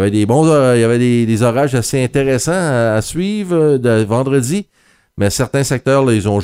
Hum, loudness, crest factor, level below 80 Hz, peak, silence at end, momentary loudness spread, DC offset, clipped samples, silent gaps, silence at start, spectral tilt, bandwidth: none; -14 LUFS; 12 dB; -44 dBFS; 0 dBFS; 0 s; 6 LU; under 0.1%; under 0.1%; none; 0 s; -6 dB/octave; 16 kHz